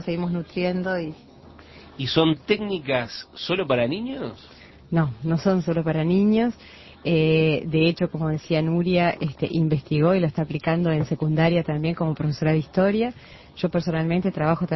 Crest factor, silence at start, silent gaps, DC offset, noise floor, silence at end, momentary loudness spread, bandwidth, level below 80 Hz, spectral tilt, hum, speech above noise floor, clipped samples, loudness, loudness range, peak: 18 dB; 0 s; none; under 0.1%; -46 dBFS; 0 s; 9 LU; 6 kHz; -50 dBFS; -8 dB/octave; none; 24 dB; under 0.1%; -23 LUFS; 3 LU; -6 dBFS